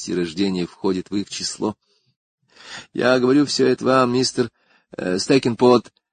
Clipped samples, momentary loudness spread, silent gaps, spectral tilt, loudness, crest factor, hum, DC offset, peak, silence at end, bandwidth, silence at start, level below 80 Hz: under 0.1%; 12 LU; 2.16-2.38 s; -5 dB/octave; -20 LUFS; 20 dB; none; under 0.1%; -2 dBFS; 0.3 s; 9.6 kHz; 0 s; -56 dBFS